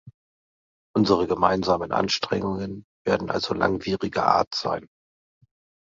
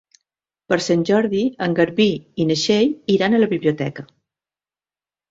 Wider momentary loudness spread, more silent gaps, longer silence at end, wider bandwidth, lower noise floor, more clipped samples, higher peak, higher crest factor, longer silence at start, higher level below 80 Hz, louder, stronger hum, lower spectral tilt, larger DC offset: first, 9 LU vs 6 LU; first, 0.14-0.94 s, 2.84-3.05 s, 4.47-4.51 s vs none; second, 1 s vs 1.25 s; about the same, 7.8 kHz vs 7.8 kHz; about the same, under -90 dBFS vs under -90 dBFS; neither; about the same, -2 dBFS vs -2 dBFS; about the same, 22 dB vs 18 dB; second, 0.05 s vs 0.7 s; first, -52 dBFS vs -60 dBFS; second, -24 LUFS vs -19 LUFS; neither; about the same, -5.5 dB/octave vs -5.5 dB/octave; neither